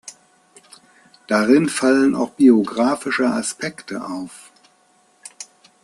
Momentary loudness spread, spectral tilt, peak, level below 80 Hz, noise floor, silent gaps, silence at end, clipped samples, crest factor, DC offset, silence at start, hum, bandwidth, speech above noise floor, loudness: 22 LU; -4.5 dB/octave; -2 dBFS; -64 dBFS; -58 dBFS; none; 0.4 s; under 0.1%; 18 dB; under 0.1%; 0.05 s; none; 12.5 kHz; 40 dB; -18 LUFS